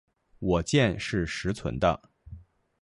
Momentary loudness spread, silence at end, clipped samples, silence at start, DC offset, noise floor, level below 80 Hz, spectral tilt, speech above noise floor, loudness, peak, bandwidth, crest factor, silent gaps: 8 LU; 0.45 s; under 0.1%; 0.4 s; under 0.1%; -49 dBFS; -44 dBFS; -5.5 dB/octave; 22 dB; -28 LUFS; -10 dBFS; 11.5 kHz; 20 dB; none